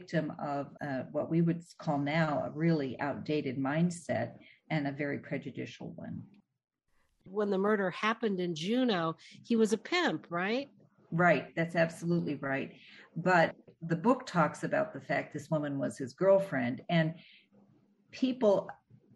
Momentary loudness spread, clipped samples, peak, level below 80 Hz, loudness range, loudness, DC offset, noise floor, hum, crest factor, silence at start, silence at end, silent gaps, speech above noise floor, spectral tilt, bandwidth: 13 LU; under 0.1%; -14 dBFS; -74 dBFS; 5 LU; -32 LUFS; under 0.1%; -74 dBFS; none; 18 dB; 0 s; 0.4 s; none; 42 dB; -6.5 dB/octave; 11.5 kHz